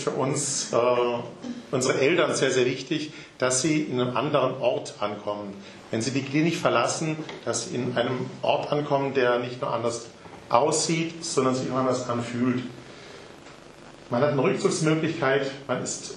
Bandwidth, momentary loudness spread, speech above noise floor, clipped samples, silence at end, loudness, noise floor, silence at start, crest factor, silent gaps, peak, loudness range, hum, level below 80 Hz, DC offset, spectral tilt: 12 kHz; 13 LU; 21 dB; under 0.1%; 0 s; -25 LUFS; -47 dBFS; 0 s; 22 dB; none; -4 dBFS; 3 LU; none; -66 dBFS; under 0.1%; -4.5 dB/octave